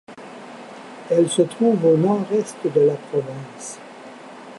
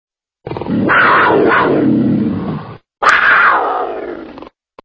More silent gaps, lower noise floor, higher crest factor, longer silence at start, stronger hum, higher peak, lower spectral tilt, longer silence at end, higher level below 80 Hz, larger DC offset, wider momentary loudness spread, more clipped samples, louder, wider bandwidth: neither; about the same, -39 dBFS vs -36 dBFS; about the same, 16 dB vs 14 dB; second, 0.1 s vs 0.45 s; neither; second, -4 dBFS vs 0 dBFS; about the same, -6 dB/octave vs -6 dB/octave; second, 0 s vs 0.35 s; second, -72 dBFS vs -44 dBFS; neither; first, 22 LU vs 18 LU; neither; second, -19 LUFS vs -11 LUFS; first, 11.5 kHz vs 8 kHz